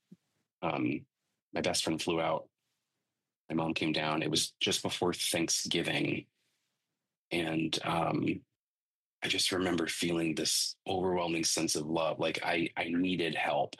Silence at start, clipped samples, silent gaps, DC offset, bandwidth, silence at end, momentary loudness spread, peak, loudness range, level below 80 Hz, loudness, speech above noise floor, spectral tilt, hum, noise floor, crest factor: 0.6 s; under 0.1%; 1.42-1.52 s, 3.36-3.48 s, 7.17-7.31 s, 8.56-9.22 s; under 0.1%; 12.5 kHz; 0.1 s; 6 LU; -16 dBFS; 4 LU; -68 dBFS; -32 LUFS; over 58 dB; -3 dB/octave; none; under -90 dBFS; 18 dB